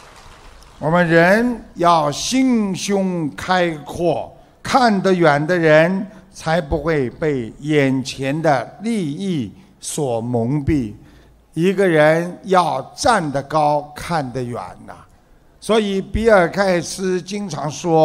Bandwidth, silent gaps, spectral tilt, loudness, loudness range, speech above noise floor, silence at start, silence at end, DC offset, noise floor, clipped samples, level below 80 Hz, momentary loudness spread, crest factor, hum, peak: 16 kHz; none; -5.5 dB/octave; -18 LUFS; 4 LU; 33 dB; 0.15 s; 0 s; under 0.1%; -50 dBFS; under 0.1%; -40 dBFS; 12 LU; 18 dB; none; 0 dBFS